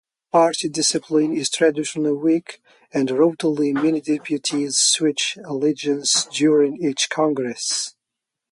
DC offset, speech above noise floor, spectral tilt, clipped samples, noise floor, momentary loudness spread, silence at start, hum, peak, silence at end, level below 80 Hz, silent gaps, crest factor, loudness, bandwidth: under 0.1%; 63 dB; -3 dB/octave; under 0.1%; -83 dBFS; 7 LU; 0.35 s; none; -4 dBFS; 0.6 s; -70 dBFS; none; 16 dB; -20 LUFS; 11.5 kHz